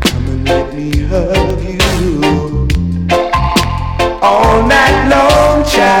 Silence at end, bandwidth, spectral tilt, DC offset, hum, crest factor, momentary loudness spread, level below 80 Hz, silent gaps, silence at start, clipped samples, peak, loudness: 0 s; 19.5 kHz; -5 dB/octave; under 0.1%; none; 10 dB; 7 LU; -20 dBFS; none; 0 s; under 0.1%; -2 dBFS; -11 LUFS